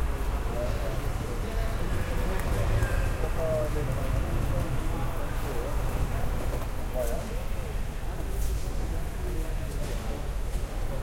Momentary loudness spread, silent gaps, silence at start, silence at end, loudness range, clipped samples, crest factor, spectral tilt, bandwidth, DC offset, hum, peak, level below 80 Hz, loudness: 6 LU; none; 0 s; 0 s; 4 LU; under 0.1%; 14 dB; -6 dB/octave; 16.5 kHz; under 0.1%; none; -14 dBFS; -30 dBFS; -32 LUFS